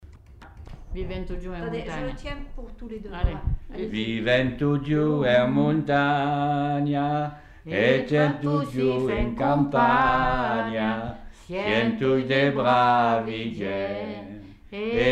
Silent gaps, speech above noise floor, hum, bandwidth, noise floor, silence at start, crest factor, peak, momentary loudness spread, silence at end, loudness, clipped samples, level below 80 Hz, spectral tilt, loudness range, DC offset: none; 23 dB; none; 9.2 kHz; -47 dBFS; 0.05 s; 16 dB; -8 dBFS; 16 LU; 0 s; -24 LUFS; under 0.1%; -38 dBFS; -7.5 dB/octave; 9 LU; under 0.1%